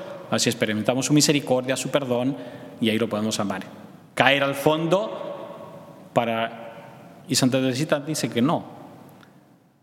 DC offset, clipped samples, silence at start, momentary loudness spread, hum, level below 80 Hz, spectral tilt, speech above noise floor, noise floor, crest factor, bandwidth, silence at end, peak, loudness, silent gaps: under 0.1%; under 0.1%; 0 s; 20 LU; none; -70 dBFS; -4 dB/octave; 32 dB; -55 dBFS; 24 dB; 17 kHz; 0.7 s; 0 dBFS; -23 LUFS; none